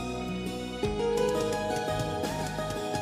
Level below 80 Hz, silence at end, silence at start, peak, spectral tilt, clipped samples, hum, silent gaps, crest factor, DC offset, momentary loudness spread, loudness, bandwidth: -46 dBFS; 0 s; 0 s; -16 dBFS; -5 dB/octave; under 0.1%; none; none; 14 dB; under 0.1%; 6 LU; -31 LUFS; 16 kHz